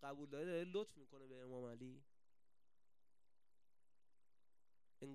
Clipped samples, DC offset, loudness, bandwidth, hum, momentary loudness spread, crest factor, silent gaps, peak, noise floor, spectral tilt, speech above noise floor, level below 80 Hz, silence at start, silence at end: under 0.1%; under 0.1%; -51 LUFS; 13 kHz; none; 16 LU; 20 dB; none; -34 dBFS; under -90 dBFS; -6 dB/octave; over 40 dB; under -90 dBFS; 0 s; 0 s